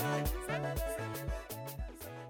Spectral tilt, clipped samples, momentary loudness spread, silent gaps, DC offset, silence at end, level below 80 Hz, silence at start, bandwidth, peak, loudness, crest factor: -5 dB/octave; under 0.1%; 9 LU; none; under 0.1%; 0 s; -44 dBFS; 0 s; over 20 kHz; -24 dBFS; -39 LUFS; 14 dB